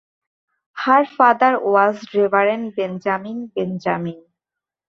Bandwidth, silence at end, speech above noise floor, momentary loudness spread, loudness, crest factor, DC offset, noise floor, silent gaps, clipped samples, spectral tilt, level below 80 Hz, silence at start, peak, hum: 6.8 kHz; 0.7 s; 69 dB; 11 LU; -18 LUFS; 18 dB; under 0.1%; -87 dBFS; none; under 0.1%; -7 dB/octave; -68 dBFS; 0.75 s; -2 dBFS; none